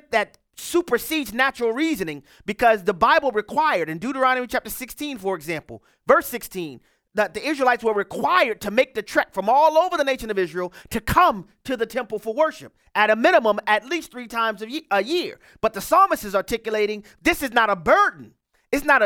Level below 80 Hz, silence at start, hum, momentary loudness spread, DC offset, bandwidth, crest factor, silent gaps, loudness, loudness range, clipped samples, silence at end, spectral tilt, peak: -48 dBFS; 0.1 s; none; 13 LU; under 0.1%; 18.5 kHz; 20 dB; none; -21 LUFS; 3 LU; under 0.1%; 0 s; -4 dB/octave; -2 dBFS